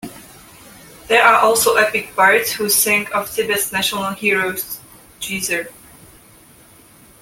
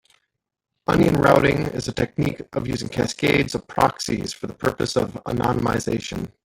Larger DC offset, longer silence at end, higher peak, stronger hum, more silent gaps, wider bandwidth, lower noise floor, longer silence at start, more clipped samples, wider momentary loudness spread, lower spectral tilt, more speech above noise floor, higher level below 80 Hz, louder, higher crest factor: neither; first, 1.5 s vs 0.15 s; about the same, 0 dBFS vs -2 dBFS; neither; neither; about the same, 17 kHz vs 17 kHz; second, -47 dBFS vs -75 dBFS; second, 0.05 s vs 0.9 s; neither; first, 14 LU vs 10 LU; second, -1.5 dB/octave vs -5.5 dB/octave; second, 30 dB vs 54 dB; second, -54 dBFS vs -44 dBFS; first, -16 LUFS vs -22 LUFS; about the same, 18 dB vs 20 dB